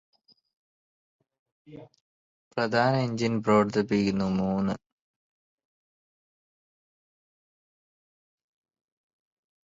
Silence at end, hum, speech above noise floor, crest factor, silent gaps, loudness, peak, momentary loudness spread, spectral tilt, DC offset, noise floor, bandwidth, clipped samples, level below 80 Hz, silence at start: 4.95 s; none; over 64 dB; 22 dB; 2.01-2.51 s; -26 LUFS; -10 dBFS; 8 LU; -7 dB/octave; under 0.1%; under -90 dBFS; 7.8 kHz; under 0.1%; -62 dBFS; 1.7 s